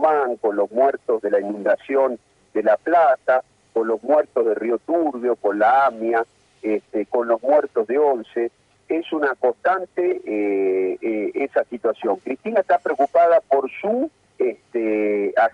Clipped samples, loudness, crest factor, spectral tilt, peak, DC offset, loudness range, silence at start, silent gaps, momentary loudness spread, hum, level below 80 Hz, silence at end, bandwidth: under 0.1%; -21 LUFS; 14 dB; -7 dB/octave; -6 dBFS; under 0.1%; 2 LU; 0 s; none; 8 LU; none; -70 dBFS; 0.05 s; 7.8 kHz